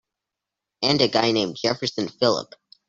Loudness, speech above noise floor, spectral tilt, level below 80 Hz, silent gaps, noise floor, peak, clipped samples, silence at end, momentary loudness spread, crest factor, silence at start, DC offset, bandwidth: -22 LUFS; 63 dB; -4.5 dB/octave; -62 dBFS; none; -86 dBFS; -2 dBFS; under 0.1%; 0.45 s; 8 LU; 22 dB; 0.8 s; under 0.1%; 7.8 kHz